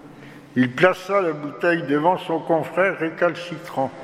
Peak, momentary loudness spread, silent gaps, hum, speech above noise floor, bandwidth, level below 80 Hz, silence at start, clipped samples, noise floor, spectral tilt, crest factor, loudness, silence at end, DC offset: 0 dBFS; 9 LU; none; none; 21 dB; 14.5 kHz; -66 dBFS; 0.05 s; under 0.1%; -42 dBFS; -6.5 dB/octave; 22 dB; -21 LUFS; 0 s; under 0.1%